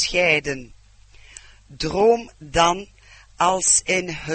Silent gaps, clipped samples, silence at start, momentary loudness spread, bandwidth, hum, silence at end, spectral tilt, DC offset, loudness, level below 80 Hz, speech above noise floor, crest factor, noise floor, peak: none; under 0.1%; 0 s; 13 LU; 8.8 kHz; none; 0 s; -2 dB/octave; under 0.1%; -19 LUFS; -44 dBFS; 28 dB; 20 dB; -49 dBFS; -2 dBFS